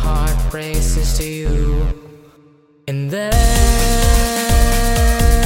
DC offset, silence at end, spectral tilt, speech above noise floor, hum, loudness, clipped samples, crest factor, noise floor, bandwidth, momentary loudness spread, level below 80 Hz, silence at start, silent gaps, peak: under 0.1%; 0 s; -4.5 dB/octave; 32 dB; none; -17 LUFS; under 0.1%; 14 dB; -49 dBFS; 17 kHz; 8 LU; -16 dBFS; 0 s; none; 0 dBFS